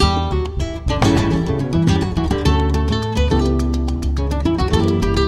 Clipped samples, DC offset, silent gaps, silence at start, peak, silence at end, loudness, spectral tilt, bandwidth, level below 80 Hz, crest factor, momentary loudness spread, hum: under 0.1%; under 0.1%; none; 0 s; -2 dBFS; 0 s; -18 LUFS; -6.5 dB/octave; 12.5 kHz; -22 dBFS; 16 dB; 5 LU; none